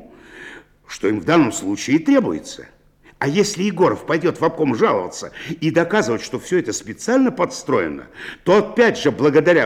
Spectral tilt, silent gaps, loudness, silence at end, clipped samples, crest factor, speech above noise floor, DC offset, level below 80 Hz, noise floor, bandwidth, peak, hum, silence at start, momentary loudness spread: -5 dB/octave; none; -18 LUFS; 0 s; under 0.1%; 16 dB; 22 dB; under 0.1%; -54 dBFS; -40 dBFS; 15.5 kHz; -4 dBFS; none; 0.3 s; 15 LU